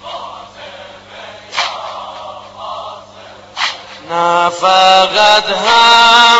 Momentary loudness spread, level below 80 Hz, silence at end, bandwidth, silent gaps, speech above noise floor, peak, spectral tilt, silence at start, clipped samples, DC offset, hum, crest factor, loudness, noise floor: 25 LU; -52 dBFS; 0 s; 15 kHz; none; 27 dB; 0 dBFS; -1 dB/octave; 0.05 s; 0.2%; under 0.1%; none; 12 dB; -9 LUFS; -36 dBFS